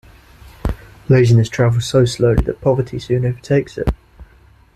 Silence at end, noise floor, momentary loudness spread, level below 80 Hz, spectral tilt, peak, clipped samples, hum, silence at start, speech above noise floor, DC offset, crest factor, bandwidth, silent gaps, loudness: 0.5 s; -48 dBFS; 13 LU; -30 dBFS; -7 dB/octave; 0 dBFS; under 0.1%; none; 0.45 s; 33 dB; under 0.1%; 16 dB; 12 kHz; none; -16 LUFS